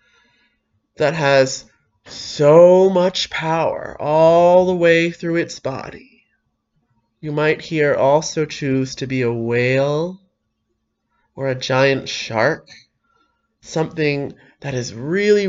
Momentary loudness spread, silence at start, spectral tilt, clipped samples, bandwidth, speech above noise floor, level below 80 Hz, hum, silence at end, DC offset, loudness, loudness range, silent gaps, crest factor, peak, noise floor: 15 LU; 1 s; -5.5 dB/octave; under 0.1%; 7.8 kHz; 55 dB; -56 dBFS; none; 0 s; under 0.1%; -17 LUFS; 8 LU; none; 18 dB; 0 dBFS; -72 dBFS